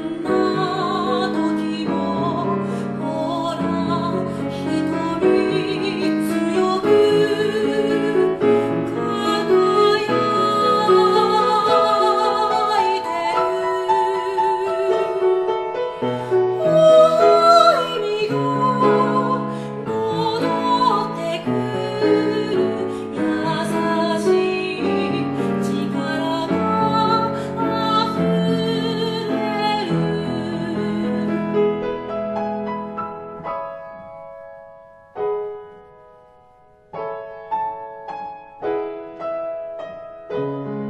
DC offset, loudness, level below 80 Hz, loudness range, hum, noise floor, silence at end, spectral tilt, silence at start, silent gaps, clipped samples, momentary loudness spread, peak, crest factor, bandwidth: under 0.1%; -19 LUFS; -58 dBFS; 14 LU; none; -51 dBFS; 0 s; -6 dB/octave; 0 s; none; under 0.1%; 13 LU; 0 dBFS; 20 dB; 13 kHz